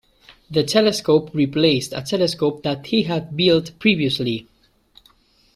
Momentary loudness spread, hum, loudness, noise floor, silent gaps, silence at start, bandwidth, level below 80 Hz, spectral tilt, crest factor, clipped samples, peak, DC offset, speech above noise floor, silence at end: 7 LU; none; -19 LUFS; -56 dBFS; none; 0.3 s; 14.5 kHz; -54 dBFS; -5 dB/octave; 18 dB; under 0.1%; -2 dBFS; under 0.1%; 37 dB; 1.15 s